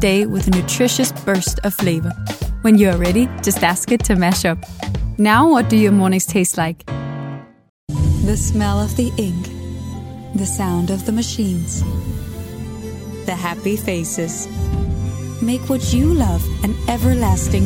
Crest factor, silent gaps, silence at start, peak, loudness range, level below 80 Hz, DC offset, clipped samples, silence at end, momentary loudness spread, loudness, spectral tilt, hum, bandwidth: 16 dB; 7.69-7.87 s; 0 s; 0 dBFS; 7 LU; -30 dBFS; under 0.1%; under 0.1%; 0 s; 14 LU; -18 LUFS; -5 dB/octave; none; 18 kHz